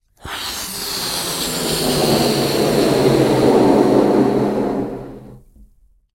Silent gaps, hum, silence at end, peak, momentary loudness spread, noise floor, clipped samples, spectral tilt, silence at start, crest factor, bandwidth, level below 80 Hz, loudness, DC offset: none; none; 0.75 s; 0 dBFS; 11 LU; -52 dBFS; under 0.1%; -4.5 dB/octave; 0.25 s; 16 dB; 16.5 kHz; -42 dBFS; -16 LUFS; under 0.1%